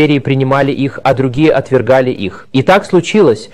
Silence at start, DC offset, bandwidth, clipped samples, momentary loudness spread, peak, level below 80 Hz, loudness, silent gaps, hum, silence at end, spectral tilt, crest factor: 0 s; 1%; 12 kHz; under 0.1%; 5 LU; 0 dBFS; -42 dBFS; -11 LUFS; none; none; 0.05 s; -6.5 dB/octave; 10 dB